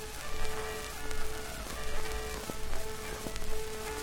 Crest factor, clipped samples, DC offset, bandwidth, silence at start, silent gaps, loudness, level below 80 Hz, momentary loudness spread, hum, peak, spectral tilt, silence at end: 18 dB; under 0.1%; under 0.1%; 17 kHz; 0 s; none; -39 LUFS; -38 dBFS; 2 LU; none; -14 dBFS; -3 dB/octave; 0 s